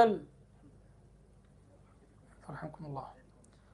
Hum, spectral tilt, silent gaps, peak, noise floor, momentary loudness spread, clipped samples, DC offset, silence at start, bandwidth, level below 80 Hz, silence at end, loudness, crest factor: none; -7 dB/octave; none; -12 dBFS; -61 dBFS; 20 LU; under 0.1%; under 0.1%; 0 s; 11.5 kHz; -64 dBFS; 0.6 s; -38 LUFS; 26 dB